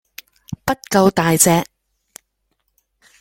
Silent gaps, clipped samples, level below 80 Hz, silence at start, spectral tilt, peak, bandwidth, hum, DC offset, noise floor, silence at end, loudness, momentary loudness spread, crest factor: none; under 0.1%; -50 dBFS; 0.65 s; -4 dB/octave; 0 dBFS; 17 kHz; none; under 0.1%; -70 dBFS; 1.6 s; -16 LUFS; 18 LU; 20 dB